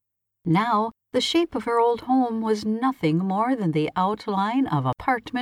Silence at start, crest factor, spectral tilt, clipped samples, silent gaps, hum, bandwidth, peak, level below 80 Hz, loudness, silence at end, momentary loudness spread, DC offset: 0.45 s; 14 dB; -6 dB/octave; under 0.1%; none; none; 13.5 kHz; -10 dBFS; -58 dBFS; -23 LUFS; 0 s; 4 LU; under 0.1%